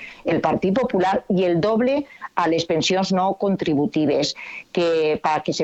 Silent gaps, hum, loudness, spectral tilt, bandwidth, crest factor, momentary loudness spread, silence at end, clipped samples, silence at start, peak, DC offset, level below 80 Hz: none; none; -21 LUFS; -5.5 dB/octave; 8.2 kHz; 18 dB; 5 LU; 0 s; under 0.1%; 0 s; -4 dBFS; under 0.1%; -54 dBFS